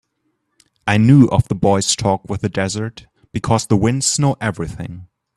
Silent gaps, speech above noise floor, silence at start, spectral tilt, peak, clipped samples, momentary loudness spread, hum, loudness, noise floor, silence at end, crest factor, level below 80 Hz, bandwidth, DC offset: none; 53 dB; 0.85 s; -5 dB/octave; 0 dBFS; under 0.1%; 15 LU; none; -16 LUFS; -69 dBFS; 0.3 s; 16 dB; -42 dBFS; 12.5 kHz; under 0.1%